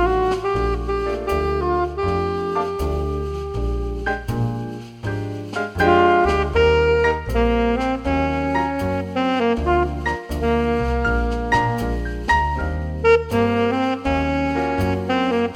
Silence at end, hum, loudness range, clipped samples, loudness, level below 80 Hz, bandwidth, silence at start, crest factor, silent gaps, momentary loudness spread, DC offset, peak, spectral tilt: 0 s; none; 5 LU; under 0.1%; -20 LUFS; -28 dBFS; 16.5 kHz; 0 s; 16 dB; none; 9 LU; under 0.1%; -4 dBFS; -7 dB/octave